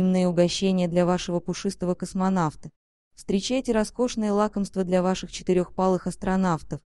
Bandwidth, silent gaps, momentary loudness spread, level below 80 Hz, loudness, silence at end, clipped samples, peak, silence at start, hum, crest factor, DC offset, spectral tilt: 11.5 kHz; 2.76-3.11 s; 6 LU; -48 dBFS; -25 LUFS; 0.15 s; under 0.1%; -6 dBFS; 0 s; none; 18 dB; 0.1%; -6 dB/octave